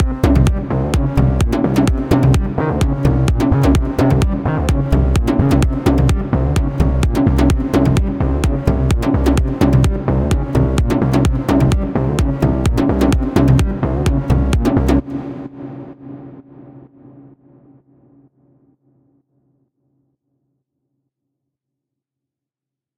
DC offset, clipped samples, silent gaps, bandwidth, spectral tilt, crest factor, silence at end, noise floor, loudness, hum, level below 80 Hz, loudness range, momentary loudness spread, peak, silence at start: under 0.1%; under 0.1%; none; 16 kHz; -7.5 dB/octave; 16 dB; 5.75 s; -87 dBFS; -15 LUFS; none; -20 dBFS; 4 LU; 4 LU; 0 dBFS; 0 s